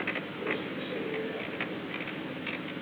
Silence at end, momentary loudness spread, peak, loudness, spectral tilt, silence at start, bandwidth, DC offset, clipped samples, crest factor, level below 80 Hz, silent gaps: 0 s; 2 LU; -18 dBFS; -35 LUFS; -6.5 dB/octave; 0 s; over 20 kHz; under 0.1%; under 0.1%; 18 dB; -72 dBFS; none